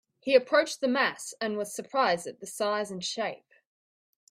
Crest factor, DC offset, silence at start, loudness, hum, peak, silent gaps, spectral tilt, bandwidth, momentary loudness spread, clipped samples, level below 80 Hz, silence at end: 22 dB; under 0.1%; 0.25 s; -28 LUFS; none; -8 dBFS; none; -3 dB/octave; 15.5 kHz; 10 LU; under 0.1%; -78 dBFS; 0.95 s